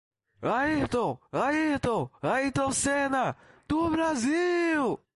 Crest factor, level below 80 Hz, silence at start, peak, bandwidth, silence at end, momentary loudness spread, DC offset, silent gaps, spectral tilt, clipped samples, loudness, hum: 14 dB; -54 dBFS; 0.4 s; -14 dBFS; 11.5 kHz; 0.2 s; 5 LU; under 0.1%; none; -4.5 dB/octave; under 0.1%; -27 LUFS; none